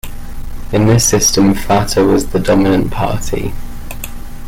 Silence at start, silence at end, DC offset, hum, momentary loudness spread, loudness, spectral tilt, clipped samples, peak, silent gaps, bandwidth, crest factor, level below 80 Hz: 0.05 s; 0 s; under 0.1%; none; 21 LU; -13 LUFS; -4.5 dB/octave; under 0.1%; 0 dBFS; none; 17 kHz; 12 dB; -24 dBFS